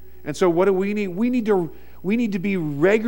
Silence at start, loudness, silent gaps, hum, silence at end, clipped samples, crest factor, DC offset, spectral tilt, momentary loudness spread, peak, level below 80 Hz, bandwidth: 0.25 s; -21 LUFS; none; none; 0 s; under 0.1%; 16 dB; 1%; -7 dB/octave; 9 LU; -6 dBFS; -50 dBFS; 16.5 kHz